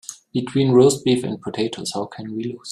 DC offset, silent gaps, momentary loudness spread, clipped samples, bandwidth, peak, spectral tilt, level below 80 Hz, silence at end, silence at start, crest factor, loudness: under 0.1%; none; 14 LU; under 0.1%; 13.5 kHz; -2 dBFS; -5.5 dB/octave; -58 dBFS; 0 s; 0.1 s; 18 dB; -20 LUFS